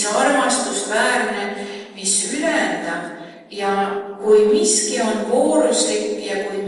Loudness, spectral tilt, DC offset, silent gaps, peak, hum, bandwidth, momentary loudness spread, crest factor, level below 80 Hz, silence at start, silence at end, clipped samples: -18 LUFS; -2 dB/octave; under 0.1%; none; -4 dBFS; none; 11.5 kHz; 11 LU; 16 dB; -64 dBFS; 0 s; 0 s; under 0.1%